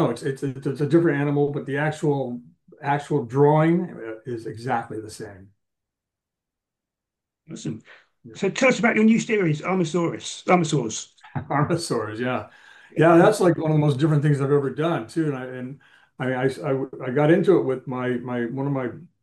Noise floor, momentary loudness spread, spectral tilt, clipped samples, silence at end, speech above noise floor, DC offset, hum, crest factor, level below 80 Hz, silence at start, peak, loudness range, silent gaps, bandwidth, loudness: -86 dBFS; 16 LU; -6.5 dB/octave; under 0.1%; 0.15 s; 64 dB; under 0.1%; none; 18 dB; -66 dBFS; 0 s; -4 dBFS; 14 LU; none; 12.5 kHz; -22 LUFS